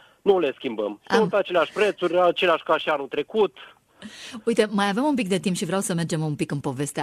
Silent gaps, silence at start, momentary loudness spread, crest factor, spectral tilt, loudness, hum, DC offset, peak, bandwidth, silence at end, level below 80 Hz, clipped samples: none; 0.25 s; 8 LU; 18 dB; -5 dB/octave; -23 LUFS; none; under 0.1%; -6 dBFS; 14 kHz; 0 s; -64 dBFS; under 0.1%